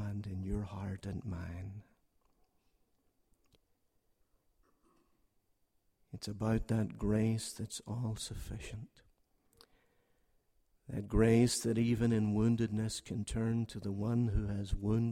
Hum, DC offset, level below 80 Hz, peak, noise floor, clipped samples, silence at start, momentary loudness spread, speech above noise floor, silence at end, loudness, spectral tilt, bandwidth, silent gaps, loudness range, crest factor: none; under 0.1%; -50 dBFS; -18 dBFS; -76 dBFS; under 0.1%; 0 s; 14 LU; 42 dB; 0 s; -35 LUFS; -6.5 dB/octave; 15 kHz; none; 15 LU; 20 dB